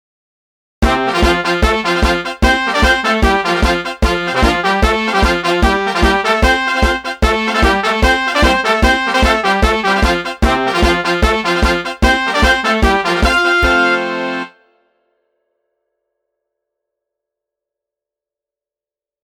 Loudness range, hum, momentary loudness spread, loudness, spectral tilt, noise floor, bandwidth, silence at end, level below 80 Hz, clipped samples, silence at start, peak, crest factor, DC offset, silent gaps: 3 LU; none; 4 LU; -13 LUFS; -4.5 dB/octave; -90 dBFS; 16.5 kHz; 4.75 s; -22 dBFS; under 0.1%; 0.8 s; 0 dBFS; 14 dB; under 0.1%; none